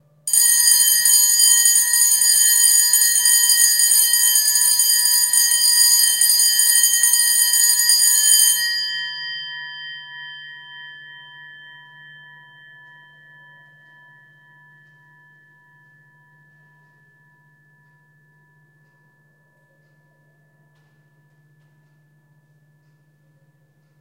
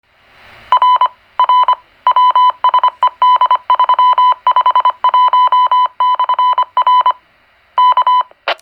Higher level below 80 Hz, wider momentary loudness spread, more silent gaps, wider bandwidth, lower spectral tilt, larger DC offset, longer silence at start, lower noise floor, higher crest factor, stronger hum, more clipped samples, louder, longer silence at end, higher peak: second, -86 dBFS vs -64 dBFS; first, 20 LU vs 5 LU; neither; first, 16.5 kHz vs 5.2 kHz; second, 4.5 dB/octave vs -1.5 dB/octave; neither; second, 0.25 s vs 0.7 s; first, -59 dBFS vs -51 dBFS; first, 18 dB vs 12 dB; neither; neither; about the same, -12 LUFS vs -11 LUFS; first, 12.55 s vs 0.1 s; about the same, 0 dBFS vs 0 dBFS